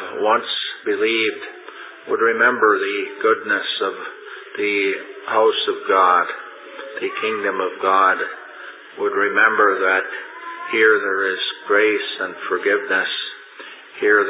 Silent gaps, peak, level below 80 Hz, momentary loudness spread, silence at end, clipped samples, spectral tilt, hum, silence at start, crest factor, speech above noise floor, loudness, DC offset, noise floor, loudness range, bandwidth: none; -2 dBFS; -80 dBFS; 19 LU; 0 s; under 0.1%; -6 dB/octave; none; 0 s; 18 dB; 20 dB; -18 LUFS; under 0.1%; -39 dBFS; 2 LU; 4 kHz